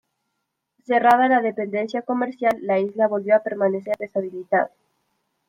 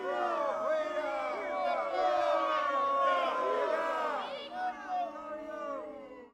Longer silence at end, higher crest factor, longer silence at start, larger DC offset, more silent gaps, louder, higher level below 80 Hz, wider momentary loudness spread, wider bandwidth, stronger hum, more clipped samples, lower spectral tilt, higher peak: first, 0.8 s vs 0.05 s; about the same, 18 dB vs 14 dB; first, 0.9 s vs 0 s; neither; neither; first, -21 LUFS vs -33 LUFS; about the same, -70 dBFS vs -72 dBFS; about the same, 9 LU vs 11 LU; first, 15.5 kHz vs 11 kHz; neither; neither; first, -7 dB/octave vs -3 dB/octave; first, -4 dBFS vs -18 dBFS